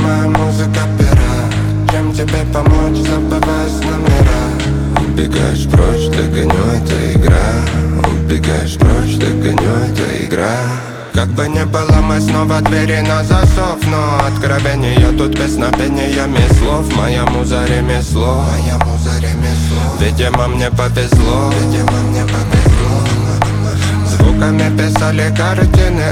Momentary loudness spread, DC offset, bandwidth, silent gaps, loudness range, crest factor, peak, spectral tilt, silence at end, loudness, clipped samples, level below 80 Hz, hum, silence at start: 4 LU; under 0.1%; 15.5 kHz; none; 2 LU; 12 dB; 0 dBFS; -6 dB/octave; 0 s; -13 LUFS; under 0.1%; -18 dBFS; none; 0 s